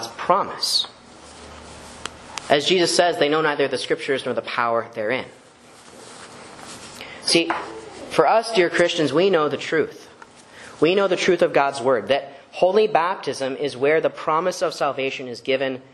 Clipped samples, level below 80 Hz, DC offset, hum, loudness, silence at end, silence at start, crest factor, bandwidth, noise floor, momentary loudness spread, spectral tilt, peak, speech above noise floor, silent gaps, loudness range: under 0.1%; -60 dBFS; under 0.1%; none; -21 LUFS; 0.1 s; 0 s; 22 dB; 12.5 kHz; -47 dBFS; 20 LU; -3.5 dB/octave; 0 dBFS; 27 dB; none; 5 LU